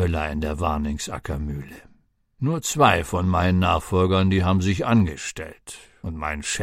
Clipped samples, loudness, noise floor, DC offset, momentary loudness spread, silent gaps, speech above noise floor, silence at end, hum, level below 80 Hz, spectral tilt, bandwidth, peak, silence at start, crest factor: under 0.1%; -22 LUFS; -59 dBFS; under 0.1%; 17 LU; none; 37 dB; 0 s; none; -36 dBFS; -5.5 dB/octave; 15 kHz; -2 dBFS; 0 s; 20 dB